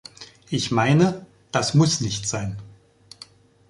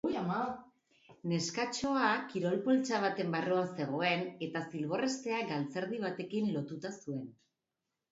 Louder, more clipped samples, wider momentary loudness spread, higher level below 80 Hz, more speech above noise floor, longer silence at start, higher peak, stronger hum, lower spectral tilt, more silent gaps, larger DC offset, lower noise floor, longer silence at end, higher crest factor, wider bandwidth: first, -22 LUFS vs -35 LUFS; neither; first, 25 LU vs 11 LU; first, -52 dBFS vs -76 dBFS; second, 30 dB vs 54 dB; first, 0.2 s vs 0.05 s; first, -4 dBFS vs -16 dBFS; neither; about the same, -5 dB/octave vs -4.5 dB/octave; neither; neither; second, -50 dBFS vs -88 dBFS; first, 1 s vs 0.8 s; about the same, 18 dB vs 18 dB; first, 11.5 kHz vs 7.6 kHz